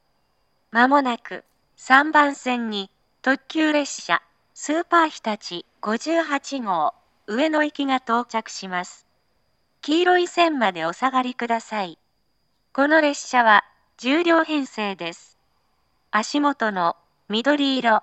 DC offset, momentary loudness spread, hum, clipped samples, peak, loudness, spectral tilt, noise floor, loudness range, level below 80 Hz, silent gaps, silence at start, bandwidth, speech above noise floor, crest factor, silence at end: under 0.1%; 13 LU; none; under 0.1%; 0 dBFS; -21 LUFS; -3.5 dB/octave; -71 dBFS; 4 LU; -76 dBFS; none; 0.75 s; 8.8 kHz; 50 dB; 22 dB; 0 s